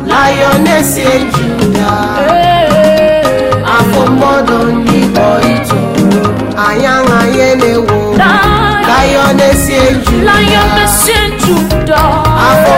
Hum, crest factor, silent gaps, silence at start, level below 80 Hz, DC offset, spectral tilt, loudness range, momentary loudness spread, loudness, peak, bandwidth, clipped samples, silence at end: none; 8 dB; none; 0 s; -22 dBFS; under 0.1%; -4.5 dB/octave; 2 LU; 4 LU; -8 LUFS; 0 dBFS; 16.5 kHz; 0.1%; 0 s